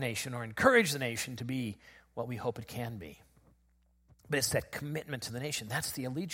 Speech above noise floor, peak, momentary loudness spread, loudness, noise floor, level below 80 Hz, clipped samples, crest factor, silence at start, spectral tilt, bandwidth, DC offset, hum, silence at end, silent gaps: 36 dB; -10 dBFS; 15 LU; -33 LUFS; -69 dBFS; -62 dBFS; under 0.1%; 26 dB; 0 s; -4 dB/octave; 16.5 kHz; under 0.1%; none; 0 s; none